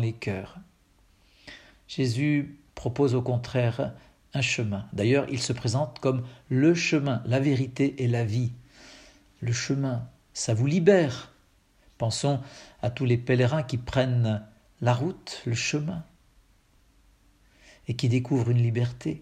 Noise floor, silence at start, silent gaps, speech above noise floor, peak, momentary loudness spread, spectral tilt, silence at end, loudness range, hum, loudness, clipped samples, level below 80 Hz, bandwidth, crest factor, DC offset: -62 dBFS; 0 s; none; 36 dB; -6 dBFS; 12 LU; -6 dB/octave; 0 s; 5 LU; none; -27 LUFS; under 0.1%; -58 dBFS; 10.5 kHz; 22 dB; under 0.1%